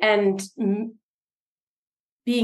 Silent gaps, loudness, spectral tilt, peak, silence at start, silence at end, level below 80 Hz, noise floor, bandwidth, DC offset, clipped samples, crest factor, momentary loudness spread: 1.03-1.92 s, 2.00-2.20 s; -25 LUFS; -5 dB/octave; -8 dBFS; 0 s; 0 s; -78 dBFS; under -90 dBFS; 12.5 kHz; under 0.1%; under 0.1%; 18 dB; 13 LU